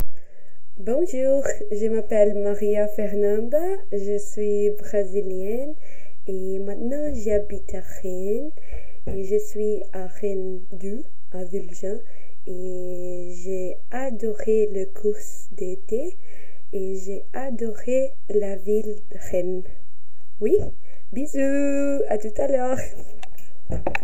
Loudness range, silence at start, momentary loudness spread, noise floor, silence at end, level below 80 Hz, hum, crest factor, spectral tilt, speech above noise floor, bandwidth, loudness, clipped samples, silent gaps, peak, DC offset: 8 LU; 0 s; 14 LU; -57 dBFS; 0 s; -46 dBFS; none; 18 dB; -7 dB/octave; 32 dB; 16 kHz; -26 LUFS; under 0.1%; none; -4 dBFS; 20%